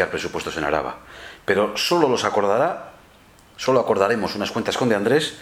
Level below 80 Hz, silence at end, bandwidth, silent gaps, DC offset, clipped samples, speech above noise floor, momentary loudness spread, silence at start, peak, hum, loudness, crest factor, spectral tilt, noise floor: -54 dBFS; 0 s; 20 kHz; none; under 0.1%; under 0.1%; 29 dB; 11 LU; 0 s; -2 dBFS; none; -21 LUFS; 20 dB; -4.5 dB/octave; -50 dBFS